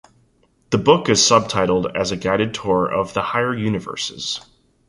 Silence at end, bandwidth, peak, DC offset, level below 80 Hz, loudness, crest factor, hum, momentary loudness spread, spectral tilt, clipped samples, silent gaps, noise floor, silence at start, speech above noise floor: 0.5 s; 11.5 kHz; -2 dBFS; under 0.1%; -48 dBFS; -19 LUFS; 18 dB; none; 11 LU; -3.5 dB/octave; under 0.1%; none; -59 dBFS; 0.7 s; 41 dB